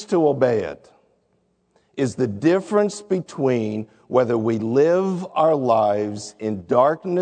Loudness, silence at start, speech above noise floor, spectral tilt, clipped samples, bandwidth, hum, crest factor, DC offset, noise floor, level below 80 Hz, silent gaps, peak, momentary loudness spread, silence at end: -21 LUFS; 0 s; 46 dB; -7 dB/octave; under 0.1%; 9.4 kHz; none; 18 dB; under 0.1%; -66 dBFS; -64 dBFS; none; -4 dBFS; 11 LU; 0 s